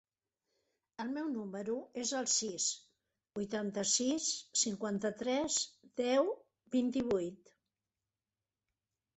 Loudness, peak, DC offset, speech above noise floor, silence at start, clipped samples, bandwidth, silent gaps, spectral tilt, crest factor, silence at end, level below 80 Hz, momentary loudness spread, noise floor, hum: -35 LUFS; -18 dBFS; under 0.1%; over 54 dB; 1 s; under 0.1%; 8.4 kHz; none; -2.5 dB/octave; 18 dB; 1.8 s; -74 dBFS; 11 LU; under -90 dBFS; none